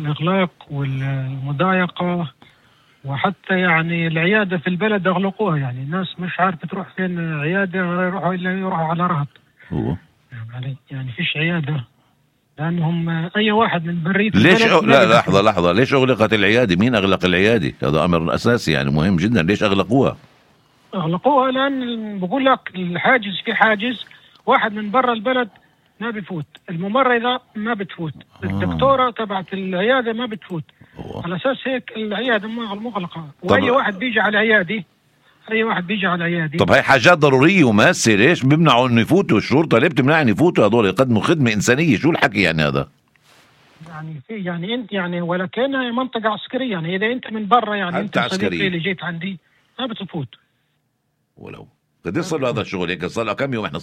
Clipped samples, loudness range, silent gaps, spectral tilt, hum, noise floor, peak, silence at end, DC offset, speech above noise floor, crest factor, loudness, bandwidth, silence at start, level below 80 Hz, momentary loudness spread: under 0.1%; 10 LU; none; -5.5 dB/octave; none; -69 dBFS; 0 dBFS; 0 s; under 0.1%; 51 dB; 18 dB; -18 LUFS; 13.5 kHz; 0 s; -50 dBFS; 15 LU